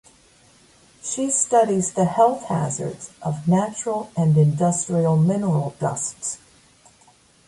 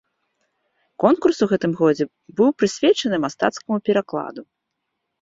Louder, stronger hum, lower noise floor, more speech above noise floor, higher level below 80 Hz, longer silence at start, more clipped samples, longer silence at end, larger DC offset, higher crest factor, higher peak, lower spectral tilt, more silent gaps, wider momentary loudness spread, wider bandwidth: about the same, -21 LUFS vs -20 LUFS; neither; second, -55 dBFS vs -78 dBFS; second, 35 dB vs 58 dB; about the same, -58 dBFS vs -62 dBFS; about the same, 1.05 s vs 1 s; neither; first, 1.1 s vs 0.8 s; neither; about the same, 18 dB vs 20 dB; about the same, -4 dBFS vs -2 dBFS; about the same, -6.5 dB/octave vs -5.5 dB/octave; neither; about the same, 12 LU vs 10 LU; first, 11.5 kHz vs 7.8 kHz